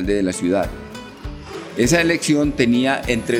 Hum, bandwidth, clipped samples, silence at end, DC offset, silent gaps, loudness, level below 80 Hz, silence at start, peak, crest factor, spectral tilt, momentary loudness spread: none; 17 kHz; under 0.1%; 0 s; under 0.1%; none; -18 LUFS; -36 dBFS; 0 s; -2 dBFS; 16 dB; -4.5 dB/octave; 18 LU